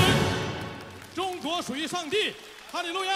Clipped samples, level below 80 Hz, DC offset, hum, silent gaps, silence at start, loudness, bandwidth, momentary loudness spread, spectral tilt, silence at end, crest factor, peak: under 0.1%; -50 dBFS; under 0.1%; none; none; 0 s; -29 LUFS; 16 kHz; 13 LU; -4 dB/octave; 0 s; 20 dB; -8 dBFS